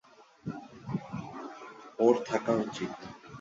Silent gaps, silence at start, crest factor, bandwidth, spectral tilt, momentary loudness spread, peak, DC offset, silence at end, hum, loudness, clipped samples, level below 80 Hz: none; 0.2 s; 22 dB; 7.8 kHz; -6.5 dB/octave; 19 LU; -12 dBFS; under 0.1%; 0 s; none; -32 LUFS; under 0.1%; -66 dBFS